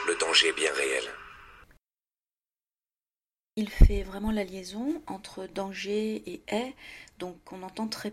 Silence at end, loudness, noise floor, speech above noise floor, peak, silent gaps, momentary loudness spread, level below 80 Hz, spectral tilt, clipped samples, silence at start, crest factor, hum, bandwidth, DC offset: 0 s; -29 LUFS; under -90 dBFS; over 62 dB; -6 dBFS; none; 19 LU; -32 dBFS; -4 dB/octave; under 0.1%; 0 s; 24 dB; none; 14 kHz; under 0.1%